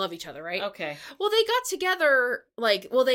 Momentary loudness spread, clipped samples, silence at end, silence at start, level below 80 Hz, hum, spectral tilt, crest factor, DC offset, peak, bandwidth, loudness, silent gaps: 12 LU; under 0.1%; 0 s; 0 s; -70 dBFS; none; -2 dB/octave; 16 dB; under 0.1%; -8 dBFS; 17 kHz; -25 LUFS; none